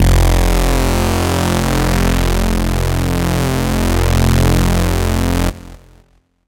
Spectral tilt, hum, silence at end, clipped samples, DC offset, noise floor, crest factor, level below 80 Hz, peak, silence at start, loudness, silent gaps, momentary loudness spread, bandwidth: -5.5 dB/octave; none; 0.7 s; under 0.1%; under 0.1%; -52 dBFS; 14 dB; -18 dBFS; 0 dBFS; 0 s; -15 LUFS; none; 4 LU; 17 kHz